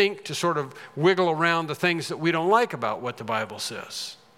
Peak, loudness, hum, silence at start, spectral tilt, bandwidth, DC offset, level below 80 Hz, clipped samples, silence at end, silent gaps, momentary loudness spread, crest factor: -6 dBFS; -25 LUFS; none; 0 s; -4.5 dB/octave; 16 kHz; under 0.1%; -78 dBFS; under 0.1%; 0.25 s; none; 11 LU; 20 dB